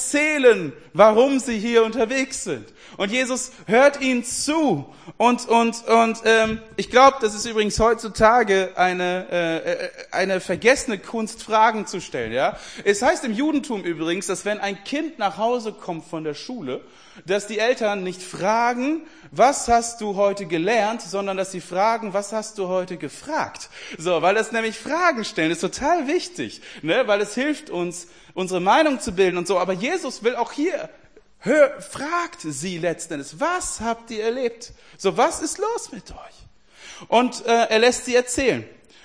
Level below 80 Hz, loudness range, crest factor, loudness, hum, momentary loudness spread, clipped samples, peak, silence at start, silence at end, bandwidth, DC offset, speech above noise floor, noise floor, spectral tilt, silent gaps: -50 dBFS; 7 LU; 22 dB; -21 LUFS; none; 13 LU; under 0.1%; 0 dBFS; 0 s; 0.35 s; 10.5 kHz; 0.2%; 24 dB; -45 dBFS; -3.5 dB/octave; none